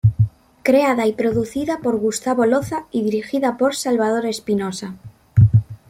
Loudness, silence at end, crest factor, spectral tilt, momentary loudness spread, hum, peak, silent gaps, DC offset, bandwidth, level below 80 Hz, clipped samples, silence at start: -19 LUFS; 0.15 s; 16 dB; -6.5 dB/octave; 7 LU; none; -2 dBFS; none; under 0.1%; 15 kHz; -42 dBFS; under 0.1%; 0.05 s